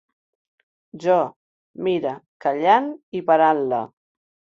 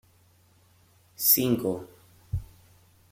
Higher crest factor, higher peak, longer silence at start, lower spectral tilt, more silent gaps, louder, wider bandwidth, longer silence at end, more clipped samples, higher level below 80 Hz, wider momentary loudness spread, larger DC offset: second, 20 dB vs 26 dB; about the same, -4 dBFS vs -4 dBFS; second, 0.95 s vs 1.2 s; first, -6.5 dB/octave vs -4 dB/octave; first, 1.36-1.74 s, 2.28-2.40 s, 3.03-3.12 s vs none; first, -21 LUFS vs -25 LUFS; second, 7.6 kHz vs 16.5 kHz; about the same, 0.65 s vs 0.65 s; neither; second, -70 dBFS vs -50 dBFS; second, 12 LU vs 17 LU; neither